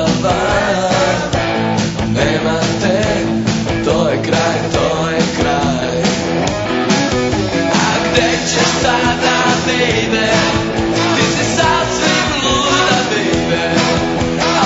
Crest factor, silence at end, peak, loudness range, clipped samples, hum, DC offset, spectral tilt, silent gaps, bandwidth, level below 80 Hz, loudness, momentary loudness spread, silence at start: 14 dB; 0 s; 0 dBFS; 2 LU; under 0.1%; none; under 0.1%; -4 dB/octave; none; 8 kHz; -34 dBFS; -14 LUFS; 4 LU; 0 s